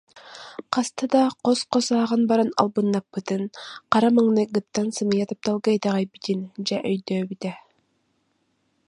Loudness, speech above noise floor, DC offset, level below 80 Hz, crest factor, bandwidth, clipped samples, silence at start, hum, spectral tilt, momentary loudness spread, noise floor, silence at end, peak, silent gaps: -23 LUFS; 47 dB; under 0.1%; -70 dBFS; 22 dB; 11 kHz; under 0.1%; 0.15 s; none; -5.5 dB/octave; 13 LU; -70 dBFS; 1.3 s; -2 dBFS; none